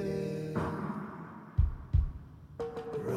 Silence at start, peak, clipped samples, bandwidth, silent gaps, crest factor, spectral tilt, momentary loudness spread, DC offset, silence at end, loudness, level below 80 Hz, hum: 0 s; -16 dBFS; under 0.1%; 12 kHz; none; 18 dB; -8.5 dB/octave; 12 LU; under 0.1%; 0 s; -36 LUFS; -38 dBFS; none